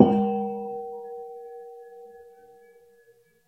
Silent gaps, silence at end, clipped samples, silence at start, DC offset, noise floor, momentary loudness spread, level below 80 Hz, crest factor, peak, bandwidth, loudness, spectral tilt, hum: none; 1.25 s; under 0.1%; 0 s; under 0.1%; -60 dBFS; 23 LU; -66 dBFS; 28 dB; 0 dBFS; 3.4 kHz; -28 LUFS; -10 dB/octave; none